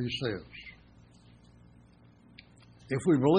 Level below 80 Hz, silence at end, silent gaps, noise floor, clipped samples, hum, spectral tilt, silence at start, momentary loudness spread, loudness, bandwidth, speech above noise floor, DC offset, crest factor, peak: -62 dBFS; 0 s; none; -58 dBFS; under 0.1%; none; -7 dB/octave; 0 s; 28 LU; -31 LUFS; 10 kHz; 30 dB; under 0.1%; 20 dB; -12 dBFS